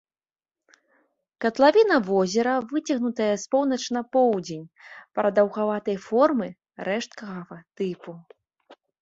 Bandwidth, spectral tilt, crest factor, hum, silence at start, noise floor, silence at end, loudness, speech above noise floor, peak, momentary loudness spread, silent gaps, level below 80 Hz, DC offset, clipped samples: 8 kHz; -5 dB/octave; 20 dB; none; 1.4 s; under -90 dBFS; 0.3 s; -23 LUFS; over 66 dB; -4 dBFS; 17 LU; none; -70 dBFS; under 0.1%; under 0.1%